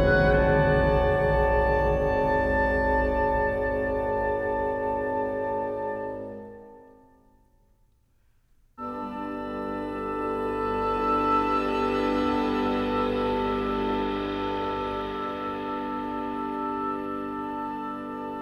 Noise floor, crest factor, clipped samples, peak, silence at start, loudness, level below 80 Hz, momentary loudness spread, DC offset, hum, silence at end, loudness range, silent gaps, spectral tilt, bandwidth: -64 dBFS; 16 dB; under 0.1%; -10 dBFS; 0 s; -26 LUFS; -38 dBFS; 11 LU; under 0.1%; none; 0 s; 13 LU; none; -8 dB/octave; 12 kHz